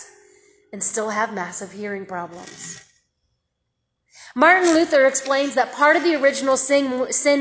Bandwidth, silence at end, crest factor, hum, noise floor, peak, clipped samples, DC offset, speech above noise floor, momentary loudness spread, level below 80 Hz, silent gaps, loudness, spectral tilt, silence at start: 8 kHz; 0 s; 20 dB; none; -76 dBFS; -2 dBFS; under 0.1%; under 0.1%; 56 dB; 19 LU; -66 dBFS; none; -18 LUFS; -2.5 dB/octave; 0 s